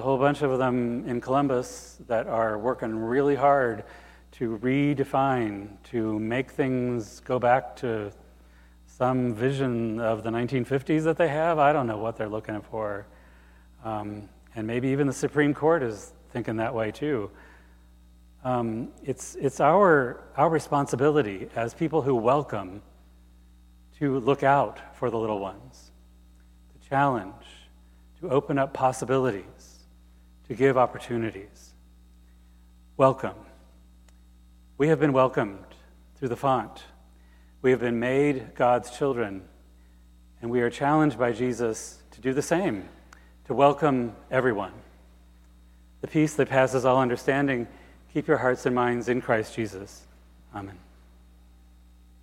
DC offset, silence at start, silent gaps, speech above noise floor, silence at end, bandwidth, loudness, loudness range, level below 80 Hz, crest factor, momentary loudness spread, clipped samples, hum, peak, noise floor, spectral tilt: under 0.1%; 0 s; none; 28 dB; 1.45 s; 15.5 kHz; -26 LUFS; 5 LU; -54 dBFS; 20 dB; 15 LU; under 0.1%; 60 Hz at -55 dBFS; -6 dBFS; -54 dBFS; -6.5 dB/octave